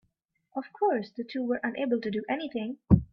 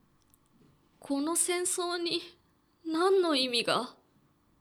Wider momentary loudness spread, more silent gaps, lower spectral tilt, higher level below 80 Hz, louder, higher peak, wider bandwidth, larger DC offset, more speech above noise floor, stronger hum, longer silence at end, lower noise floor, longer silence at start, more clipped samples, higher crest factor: about the same, 12 LU vs 11 LU; neither; first, -10 dB/octave vs -1.5 dB/octave; first, -46 dBFS vs -78 dBFS; about the same, -30 LUFS vs -29 LUFS; first, -6 dBFS vs -14 dBFS; second, 5.6 kHz vs 19.5 kHz; neither; first, 47 dB vs 38 dB; neither; second, 0.1 s vs 0.7 s; first, -75 dBFS vs -68 dBFS; second, 0.55 s vs 1 s; neither; about the same, 24 dB vs 20 dB